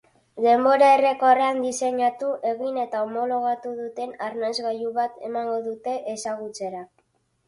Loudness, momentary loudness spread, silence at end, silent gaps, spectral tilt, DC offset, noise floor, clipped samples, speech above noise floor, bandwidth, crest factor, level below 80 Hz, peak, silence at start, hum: -23 LUFS; 14 LU; 0.6 s; none; -3 dB/octave; under 0.1%; -68 dBFS; under 0.1%; 45 dB; 11.5 kHz; 16 dB; -74 dBFS; -6 dBFS; 0.35 s; none